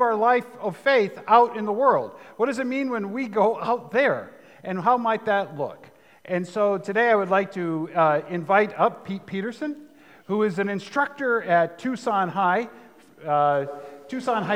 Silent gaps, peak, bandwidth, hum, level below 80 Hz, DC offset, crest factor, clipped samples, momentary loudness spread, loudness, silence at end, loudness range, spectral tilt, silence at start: none; -4 dBFS; 15 kHz; none; -80 dBFS; under 0.1%; 20 dB; under 0.1%; 12 LU; -23 LUFS; 0 s; 3 LU; -6.5 dB/octave; 0 s